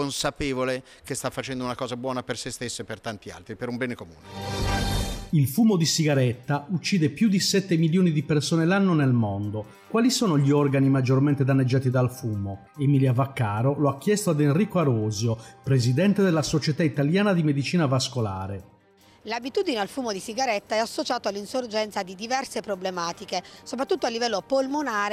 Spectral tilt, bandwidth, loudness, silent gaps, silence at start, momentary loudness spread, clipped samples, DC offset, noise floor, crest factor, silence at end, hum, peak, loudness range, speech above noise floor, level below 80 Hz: -5.5 dB/octave; 16 kHz; -25 LUFS; none; 0 s; 11 LU; under 0.1%; under 0.1%; -56 dBFS; 14 dB; 0 s; none; -10 dBFS; 7 LU; 32 dB; -46 dBFS